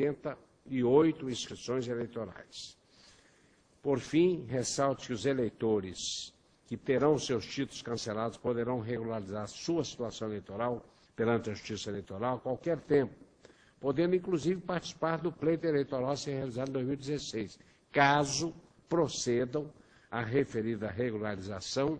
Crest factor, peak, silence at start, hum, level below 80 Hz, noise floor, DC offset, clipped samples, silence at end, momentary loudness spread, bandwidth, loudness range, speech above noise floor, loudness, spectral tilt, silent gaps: 22 dB; -12 dBFS; 0 s; none; -64 dBFS; -66 dBFS; under 0.1%; under 0.1%; 0 s; 12 LU; 10.5 kHz; 4 LU; 33 dB; -33 LUFS; -5 dB/octave; none